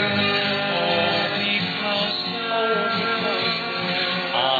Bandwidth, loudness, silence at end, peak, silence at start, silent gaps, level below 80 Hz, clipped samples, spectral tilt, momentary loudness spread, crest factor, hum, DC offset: 4.9 kHz; -21 LUFS; 0 s; -8 dBFS; 0 s; none; -68 dBFS; under 0.1%; -5.5 dB/octave; 3 LU; 16 dB; none; under 0.1%